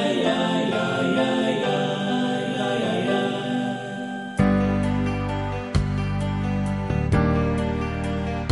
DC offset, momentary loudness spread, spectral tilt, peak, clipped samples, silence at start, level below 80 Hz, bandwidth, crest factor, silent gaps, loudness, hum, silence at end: under 0.1%; 5 LU; -6.5 dB/octave; -8 dBFS; under 0.1%; 0 s; -36 dBFS; 11.5 kHz; 16 dB; none; -24 LUFS; none; 0 s